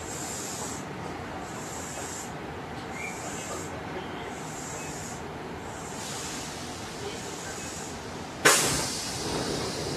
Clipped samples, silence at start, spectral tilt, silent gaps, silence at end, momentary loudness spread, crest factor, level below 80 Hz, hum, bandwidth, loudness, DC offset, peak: under 0.1%; 0 s; -2.5 dB/octave; none; 0 s; 12 LU; 28 dB; -52 dBFS; none; 14 kHz; -31 LUFS; under 0.1%; -4 dBFS